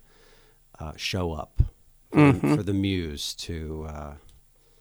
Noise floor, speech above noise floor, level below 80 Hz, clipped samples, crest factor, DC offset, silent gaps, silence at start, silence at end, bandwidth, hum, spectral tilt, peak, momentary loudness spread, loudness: -57 dBFS; 32 dB; -38 dBFS; under 0.1%; 20 dB; under 0.1%; none; 0.8 s; 0.65 s; over 20 kHz; none; -6 dB/octave; -6 dBFS; 20 LU; -26 LUFS